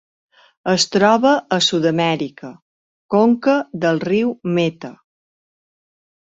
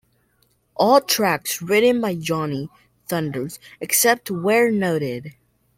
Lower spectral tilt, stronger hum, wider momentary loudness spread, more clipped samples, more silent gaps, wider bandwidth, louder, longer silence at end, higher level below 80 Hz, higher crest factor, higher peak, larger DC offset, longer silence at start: about the same, -4.5 dB/octave vs -3.5 dB/octave; neither; about the same, 14 LU vs 16 LU; neither; first, 2.62-3.09 s vs none; second, 8.2 kHz vs 16.5 kHz; first, -17 LUFS vs -20 LUFS; first, 1.35 s vs 0.45 s; about the same, -62 dBFS vs -62 dBFS; about the same, 16 dB vs 18 dB; about the same, -2 dBFS vs -2 dBFS; neither; second, 0.65 s vs 0.8 s